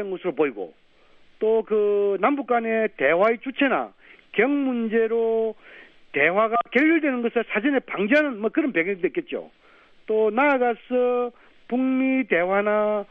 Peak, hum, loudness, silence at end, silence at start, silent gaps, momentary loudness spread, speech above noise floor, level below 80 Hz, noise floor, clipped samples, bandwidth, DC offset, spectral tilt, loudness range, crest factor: -4 dBFS; none; -22 LUFS; 0.05 s; 0 s; none; 9 LU; 32 dB; -66 dBFS; -54 dBFS; under 0.1%; 5.2 kHz; under 0.1%; -7.5 dB/octave; 2 LU; 18 dB